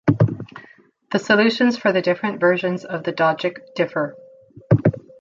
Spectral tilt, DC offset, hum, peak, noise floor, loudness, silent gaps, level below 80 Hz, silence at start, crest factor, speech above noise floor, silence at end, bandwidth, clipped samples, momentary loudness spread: -7 dB/octave; under 0.1%; none; -2 dBFS; -50 dBFS; -20 LUFS; none; -52 dBFS; 0.05 s; 18 dB; 31 dB; 0.2 s; 7.6 kHz; under 0.1%; 10 LU